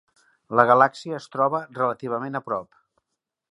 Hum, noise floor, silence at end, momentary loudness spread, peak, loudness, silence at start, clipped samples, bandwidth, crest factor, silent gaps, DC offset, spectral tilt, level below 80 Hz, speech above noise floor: none; -83 dBFS; 0.85 s; 14 LU; -2 dBFS; -22 LUFS; 0.5 s; under 0.1%; 11 kHz; 22 dB; none; under 0.1%; -6.5 dB/octave; -72 dBFS; 60 dB